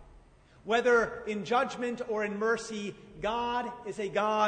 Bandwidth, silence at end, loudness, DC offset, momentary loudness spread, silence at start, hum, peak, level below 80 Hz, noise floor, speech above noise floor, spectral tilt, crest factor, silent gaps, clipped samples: 9.6 kHz; 0 s; -31 LUFS; under 0.1%; 12 LU; 0 s; none; -14 dBFS; -60 dBFS; -57 dBFS; 27 dB; -4.5 dB/octave; 16 dB; none; under 0.1%